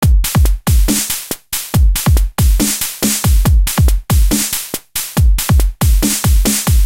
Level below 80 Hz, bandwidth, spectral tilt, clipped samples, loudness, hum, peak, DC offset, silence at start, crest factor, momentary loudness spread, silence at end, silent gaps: -14 dBFS; 17 kHz; -4 dB/octave; under 0.1%; -14 LUFS; none; -2 dBFS; 0.7%; 0 s; 10 dB; 5 LU; 0 s; none